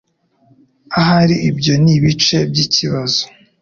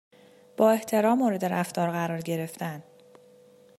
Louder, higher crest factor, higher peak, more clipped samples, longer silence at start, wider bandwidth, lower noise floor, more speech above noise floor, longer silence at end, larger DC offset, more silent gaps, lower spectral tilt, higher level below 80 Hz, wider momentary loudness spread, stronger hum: first, -13 LUFS vs -26 LUFS; second, 14 dB vs 20 dB; first, -2 dBFS vs -8 dBFS; neither; first, 0.9 s vs 0.6 s; second, 7.2 kHz vs 16 kHz; about the same, -55 dBFS vs -55 dBFS; first, 41 dB vs 30 dB; second, 0.35 s vs 0.95 s; neither; neither; about the same, -5 dB/octave vs -6 dB/octave; first, -44 dBFS vs -76 dBFS; second, 6 LU vs 13 LU; neither